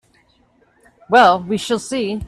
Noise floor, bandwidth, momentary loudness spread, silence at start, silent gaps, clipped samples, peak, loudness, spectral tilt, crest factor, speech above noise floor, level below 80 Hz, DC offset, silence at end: -57 dBFS; 13 kHz; 9 LU; 1.1 s; none; under 0.1%; 0 dBFS; -16 LUFS; -4 dB/octave; 18 dB; 41 dB; -48 dBFS; under 0.1%; 0 s